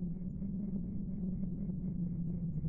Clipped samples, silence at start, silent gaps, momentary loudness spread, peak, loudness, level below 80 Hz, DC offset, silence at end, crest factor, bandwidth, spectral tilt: under 0.1%; 0 s; none; 3 LU; -26 dBFS; -39 LUFS; -48 dBFS; under 0.1%; 0 s; 12 dB; 1.3 kHz; -16 dB/octave